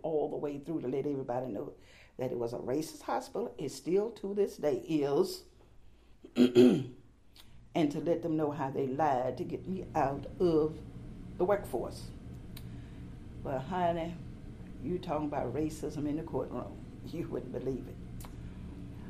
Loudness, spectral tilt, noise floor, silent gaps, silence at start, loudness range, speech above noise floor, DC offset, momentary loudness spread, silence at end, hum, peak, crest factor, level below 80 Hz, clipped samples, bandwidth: -33 LUFS; -7 dB/octave; -56 dBFS; none; 0.05 s; 8 LU; 24 dB; under 0.1%; 17 LU; 0 s; none; -10 dBFS; 22 dB; -54 dBFS; under 0.1%; 15 kHz